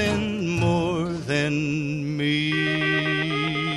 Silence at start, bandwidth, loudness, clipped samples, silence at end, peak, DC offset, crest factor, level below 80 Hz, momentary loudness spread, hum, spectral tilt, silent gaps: 0 s; 12 kHz; -23 LUFS; under 0.1%; 0 s; -10 dBFS; under 0.1%; 14 dB; -48 dBFS; 4 LU; none; -5.5 dB/octave; none